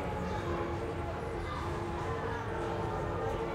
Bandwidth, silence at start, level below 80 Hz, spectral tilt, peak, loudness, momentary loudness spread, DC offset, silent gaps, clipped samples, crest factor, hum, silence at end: 15.5 kHz; 0 s; -46 dBFS; -7 dB/octave; -22 dBFS; -36 LUFS; 2 LU; under 0.1%; none; under 0.1%; 12 dB; none; 0 s